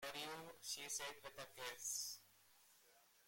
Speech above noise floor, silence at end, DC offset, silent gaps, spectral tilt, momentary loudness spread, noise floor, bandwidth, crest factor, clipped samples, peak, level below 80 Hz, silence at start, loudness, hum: 23 dB; 0 s; under 0.1%; none; 0 dB/octave; 24 LU; -72 dBFS; 16.5 kHz; 18 dB; under 0.1%; -34 dBFS; -84 dBFS; 0 s; -48 LUFS; none